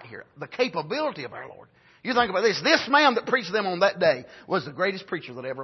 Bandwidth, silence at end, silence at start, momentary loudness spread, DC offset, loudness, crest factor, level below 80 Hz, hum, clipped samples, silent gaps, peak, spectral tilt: 6.2 kHz; 0 s; 0 s; 18 LU; under 0.1%; -24 LUFS; 20 dB; -68 dBFS; none; under 0.1%; none; -6 dBFS; -4 dB/octave